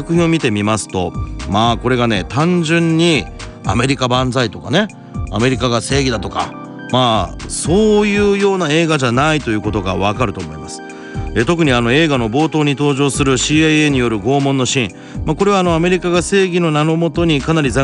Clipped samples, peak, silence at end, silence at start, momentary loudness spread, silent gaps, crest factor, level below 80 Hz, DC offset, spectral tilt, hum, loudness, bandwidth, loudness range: under 0.1%; -2 dBFS; 0 s; 0 s; 10 LU; none; 14 dB; -32 dBFS; under 0.1%; -5 dB/octave; none; -15 LUFS; 10.5 kHz; 3 LU